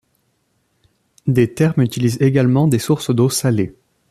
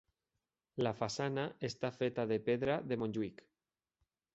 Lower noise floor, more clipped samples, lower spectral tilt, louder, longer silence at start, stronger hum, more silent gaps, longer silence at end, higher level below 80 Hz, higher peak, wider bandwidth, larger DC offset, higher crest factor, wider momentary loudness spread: second, -65 dBFS vs under -90 dBFS; neither; first, -6.5 dB/octave vs -5 dB/octave; first, -17 LUFS vs -38 LUFS; first, 1.25 s vs 0.75 s; neither; neither; second, 0.4 s vs 1 s; first, -52 dBFS vs -70 dBFS; first, -2 dBFS vs -20 dBFS; first, 14.5 kHz vs 8 kHz; neither; about the same, 16 dB vs 18 dB; about the same, 5 LU vs 6 LU